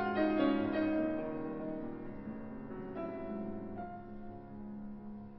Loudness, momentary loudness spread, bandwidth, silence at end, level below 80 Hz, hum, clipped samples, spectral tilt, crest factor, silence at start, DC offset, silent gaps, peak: -38 LUFS; 16 LU; 5.6 kHz; 0 s; -58 dBFS; none; under 0.1%; -5.5 dB/octave; 18 dB; 0 s; under 0.1%; none; -20 dBFS